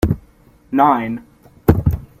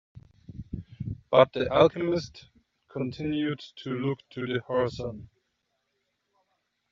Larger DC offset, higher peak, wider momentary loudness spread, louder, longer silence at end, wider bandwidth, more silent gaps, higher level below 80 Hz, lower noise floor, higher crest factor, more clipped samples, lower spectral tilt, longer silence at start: neither; first, -2 dBFS vs -6 dBFS; second, 12 LU vs 19 LU; first, -18 LUFS vs -27 LUFS; second, 0.15 s vs 1.65 s; first, 15.5 kHz vs 7.4 kHz; neither; first, -30 dBFS vs -56 dBFS; second, -49 dBFS vs -78 dBFS; second, 16 dB vs 24 dB; neither; first, -8.5 dB/octave vs -5 dB/octave; second, 0 s vs 0.15 s